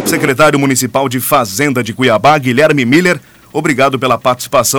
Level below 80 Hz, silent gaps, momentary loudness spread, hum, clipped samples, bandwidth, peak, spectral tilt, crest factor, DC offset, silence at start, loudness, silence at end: -46 dBFS; none; 5 LU; none; under 0.1%; over 20 kHz; -2 dBFS; -4 dB/octave; 10 dB; under 0.1%; 0 s; -11 LUFS; 0 s